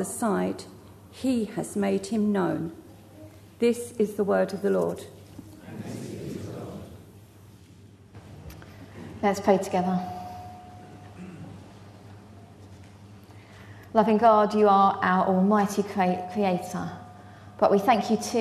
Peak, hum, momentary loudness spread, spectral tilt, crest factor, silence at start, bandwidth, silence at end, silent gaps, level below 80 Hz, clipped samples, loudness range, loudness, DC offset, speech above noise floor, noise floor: -8 dBFS; none; 25 LU; -6 dB/octave; 20 dB; 0 s; 13.5 kHz; 0 s; none; -62 dBFS; under 0.1%; 18 LU; -25 LUFS; under 0.1%; 27 dB; -51 dBFS